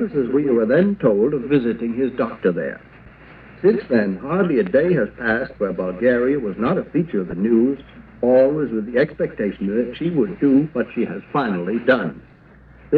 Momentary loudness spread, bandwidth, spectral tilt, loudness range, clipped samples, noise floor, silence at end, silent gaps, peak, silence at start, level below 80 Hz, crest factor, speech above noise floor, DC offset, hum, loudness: 7 LU; 4.8 kHz; -10.5 dB/octave; 2 LU; under 0.1%; -46 dBFS; 0 s; none; -2 dBFS; 0 s; -50 dBFS; 16 dB; 28 dB; under 0.1%; none; -20 LUFS